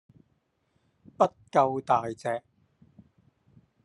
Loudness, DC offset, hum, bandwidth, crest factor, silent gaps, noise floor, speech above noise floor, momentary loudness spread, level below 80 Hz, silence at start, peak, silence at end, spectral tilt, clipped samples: -27 LUFS; under 0.1%; none; 11.5 kHz; 22 dB; none; -73 dBFS; 47 dB; 9 LU; -72 dBFS; 1.2 s; -8 dBFS; 1.45 s; -6.5 dB/octave; under 0.1%